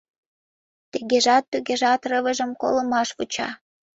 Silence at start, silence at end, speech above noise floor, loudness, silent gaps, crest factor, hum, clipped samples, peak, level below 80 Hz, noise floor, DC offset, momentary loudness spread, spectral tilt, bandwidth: 0.95 s; 0.4 s; over 68 dB; -22 LUFS; 1.48-1.52 s; 16 dB; none; under 0.1%; -6 dBFS; -66 dBFS; under -90 dBFS; under 0.1%; 13 LU; -2 dB/octave; 8 kHz